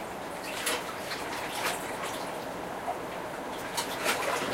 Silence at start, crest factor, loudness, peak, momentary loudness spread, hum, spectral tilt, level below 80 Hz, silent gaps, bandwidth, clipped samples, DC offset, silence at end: 0 s; 20 dB; -33 LUFS; -14 dBFS; 7 LU; none; -2 dB/octave; -60 dBFS; none; 16 kHz; under 0.1%; under 0.1%; 0 s